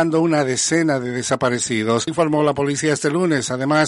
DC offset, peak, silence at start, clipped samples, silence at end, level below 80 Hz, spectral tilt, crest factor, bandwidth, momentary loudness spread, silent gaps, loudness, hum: under 0.1%; -4 dBFS; 0 s; under 0.1%; 0 s; -58 dBFS; -4.5 dB/octave; 14 dB; 11.5 kHz; 3 LU; none; -19 LUFS; none